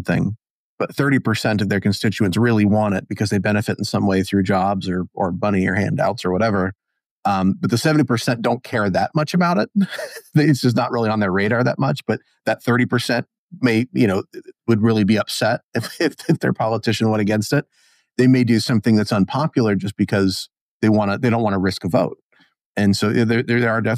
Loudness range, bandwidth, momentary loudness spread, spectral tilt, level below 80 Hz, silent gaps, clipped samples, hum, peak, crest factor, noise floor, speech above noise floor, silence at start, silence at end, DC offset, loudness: 2 LU; 15.5 kHz; 7 LU; -6.5 dB/octave; -58 dBFS; 0.50-0.78 s, 7.06-7.23 s, 13.38-13.49 s, 15.63-15.72 s, 20.61-20.80 s, 22.22-22.30 s, 22.61-22.75 s; under 0.1%; none; -4 dBFS; 16 dB; -59 dBFS; 41 dB; 0 s; 0 s; under 0.1%; -19 LUFS